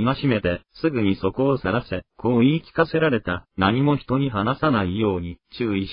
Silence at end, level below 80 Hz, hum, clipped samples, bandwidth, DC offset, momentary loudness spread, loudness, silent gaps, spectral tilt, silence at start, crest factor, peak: 0 s; -46 dBFS; none; under 0.1%; 5.4 kHz; under 0.1%; 7 LU; -22 LUFS; none; -12 dB/octave; 0 s; 16 dB; -6 dBFS